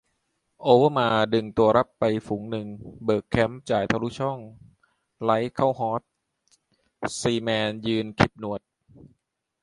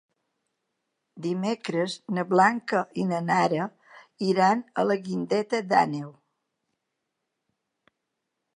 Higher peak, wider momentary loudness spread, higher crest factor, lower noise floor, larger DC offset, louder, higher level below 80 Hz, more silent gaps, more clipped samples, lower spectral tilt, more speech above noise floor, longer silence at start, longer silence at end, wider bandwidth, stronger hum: first, -2 dBFS vs -6 dBFS; about the same, 12 LU vs 10 LU; about the same, 24 dB vs 20 dB; second, -75 dBFS vs -82 dBFS; neither; about the same, -24 LUFS vs -26 LUFS; first, -54 dBFS vs -78 dBFS; neither; neither; about the same, -6 dB/octave vs -6 dB/octave; second, 51 dB vs 57 dB; second, 0.6 s vs 1.15 s; second, 1.05 s vs 2.45 s; about the same, 11.5 kHz vs 10.5 kHz; neither